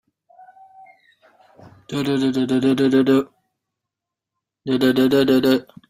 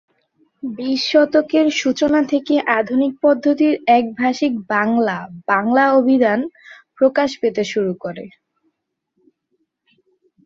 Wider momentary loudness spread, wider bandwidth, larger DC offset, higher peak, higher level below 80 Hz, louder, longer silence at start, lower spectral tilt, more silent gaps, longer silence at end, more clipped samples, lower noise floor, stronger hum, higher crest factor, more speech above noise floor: about the same, 11 LU vs 10 LU; first, 15.5 kHz vs 7.6 kHz; neither; about the same, -4 dBFS vs -2 dBFS; about the same, -60 dBFS vs -62 dBFS; about the same, -18 LUFS vs -17 LUFS; first, 1.9 s vs 0.65 s; first, -6.5 dB/octave vs -5 dB/octave; neither; second, 0.3 s vs 2.2 s; neither; first, -84 dBFS vs -72 dBFS; neither; about the same, 16 dB vs 16 dB; first, 67 dB vs 55 dB